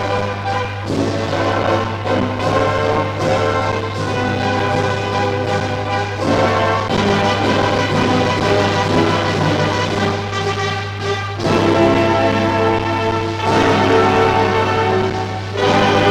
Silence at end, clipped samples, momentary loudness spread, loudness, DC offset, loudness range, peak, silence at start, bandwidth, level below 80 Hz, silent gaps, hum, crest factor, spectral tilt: 0 s; under 0.1%; 7 LU; -16 LUFS; under 0.1%; 3 LU; -2 dBFS; 0 s; 12 kHz; -40 dBFS; none; none; 14 dB; -5.5 dB/octave